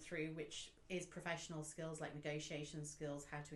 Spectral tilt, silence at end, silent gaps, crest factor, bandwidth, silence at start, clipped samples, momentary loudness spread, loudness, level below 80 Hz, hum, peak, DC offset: -4 dB/octave; 0 s; none; 18 dB; 12 kHz; 0 s; under 0.1%; 4 LU; -48 LUFS; -70 dBFS; none; -30 dBFS; under 0.1%